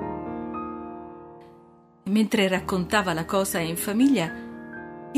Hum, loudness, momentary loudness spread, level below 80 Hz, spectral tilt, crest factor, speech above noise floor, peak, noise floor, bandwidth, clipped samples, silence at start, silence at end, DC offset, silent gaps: none; -25 LUFS; 18 LU; -54 dBFS; -4.5 dB/octave; 22 dB; 30 dB; -6 dBFS; -53 dBFS; 15.5 kHz; under 0.1%; 0 s; 0 s; under 0.1%; none